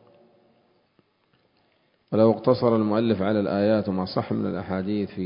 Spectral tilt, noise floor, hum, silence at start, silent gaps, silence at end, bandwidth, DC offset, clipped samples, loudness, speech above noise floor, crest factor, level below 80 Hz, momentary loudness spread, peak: -12 dB/octave; -66 dBFS; none; 2.1 s; none; 0 s; 5.4 kHz; under 0.1%; under 0.1%; -23 LUFS; 44 dB; 20 dB; -56 dBFS; 8 LU; -6 dBFS